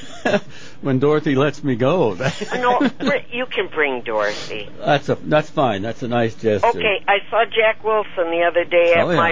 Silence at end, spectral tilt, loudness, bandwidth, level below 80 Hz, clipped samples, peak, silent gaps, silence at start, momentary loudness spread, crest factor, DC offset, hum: 0 s; -6 dB/octave; -19 LUFS; 7.6 kHz; -52 dBFS; under 0.1%; -2 dBFS; none; 0 s; 7 LU; 16 dB; 3%; none